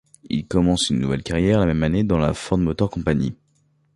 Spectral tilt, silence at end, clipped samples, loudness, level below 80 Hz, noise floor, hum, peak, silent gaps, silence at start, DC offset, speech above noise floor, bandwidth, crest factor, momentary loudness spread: -6 dB/octave; 0.6 s; under 0.1%; -21 LUFS; -36 dBFS; -63 dBFS; none; -4 dBFS; none; 0.25 s; under 0.1%; 43 dB; 11.5 kHz; 16 dB; 5 LU